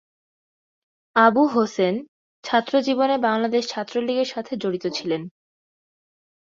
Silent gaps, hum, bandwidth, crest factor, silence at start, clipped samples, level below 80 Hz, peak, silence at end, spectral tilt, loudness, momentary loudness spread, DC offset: 2.08-2.43 s; none; 7.6 kHz; 20 dB; 1.15 s; under 0.1%; -70 dBFS; -4 dBFS; 1.2 s; -5 dB/octave; -22 LUFS; 10 LU; under 0.1%